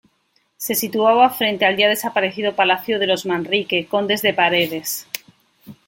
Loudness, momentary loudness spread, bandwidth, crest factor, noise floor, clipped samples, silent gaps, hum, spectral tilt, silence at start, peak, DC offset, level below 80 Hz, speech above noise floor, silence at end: -18 LUFS; 10 LU; 17 kHz; 20 dB; -65 dBFS; under 0.1%; none; none; -3 dB/octave; 0.6 s; 0 dBFS; under 0.1%; -64 dBFS; 46 dB; 0.15 s